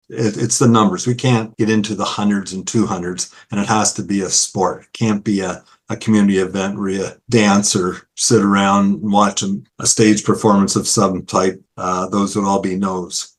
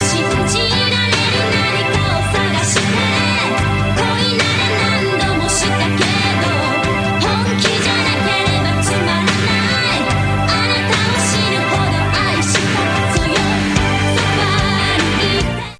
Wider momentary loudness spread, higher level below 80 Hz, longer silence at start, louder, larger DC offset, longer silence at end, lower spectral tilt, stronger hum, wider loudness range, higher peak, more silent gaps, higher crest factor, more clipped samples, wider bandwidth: first, 9 LU vs 2 LU; second, -54 dBFS vs -32 dBFS; about the same, 0.1 s vs 0 s; about the same, -16 LUFS vs -14 LUFS; neither; about the same, 0.1 s vs 0.05 s; about the same, -4.5 dB/octave vs -4 dB/octave; neither; first, 4 LU vs 0 LU; about the same, 0 dBFS vs 0 dBFS; neither; about the same, 16 dB vs 14 dB; neither; first, 12.5 kHz vs 11 kHz